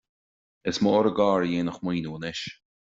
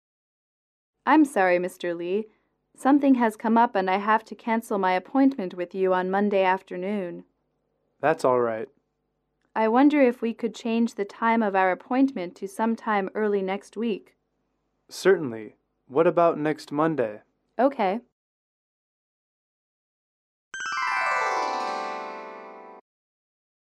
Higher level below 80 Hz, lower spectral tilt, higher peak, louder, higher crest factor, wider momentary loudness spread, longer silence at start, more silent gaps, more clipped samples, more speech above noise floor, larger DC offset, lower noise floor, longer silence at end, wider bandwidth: first, -62 dBFS vs -78 dBFS; about the same, -6 dB/octave vs -6 dB/octave; about the same, -8 dBFS vs -8 dBFS; about the same, -26 LUFS vs -24 LUFS; about the same, 18 dB vs 18 dB; about the same, 12 LU vs 14 LU; second, 0.65 s vs 1.05 s; second, none vs 18.12-20.51 s; neither; first, over 65 dB vs 53 dB; neither; first, under -90 dBFS vs -76 dBFS; second, 0.35 s vs 0.85 s; second, 7.8 kHz vs 13.5 kHz